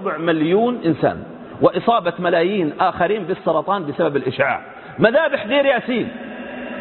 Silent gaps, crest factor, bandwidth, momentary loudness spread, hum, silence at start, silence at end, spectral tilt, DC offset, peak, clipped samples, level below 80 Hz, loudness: none; 18 dB; 4.3 kHz; 13 LU; none; 0 s; 0 s; -11 dB/octave; under 0.1%; 0 dBFS; under 0.1%; -54 dBFS; -18 LUFS